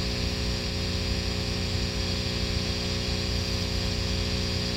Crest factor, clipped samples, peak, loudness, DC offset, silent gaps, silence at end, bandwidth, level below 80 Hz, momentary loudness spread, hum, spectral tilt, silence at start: 12 dB; under 0.1%; -16 dBFS; -28 LUFS; under 0.1%; none; 0 s; 16 kHz; -34 dBFS; 1 LU; 60 Hz at -35 dBFS; -4.5 dB/octave; 0 s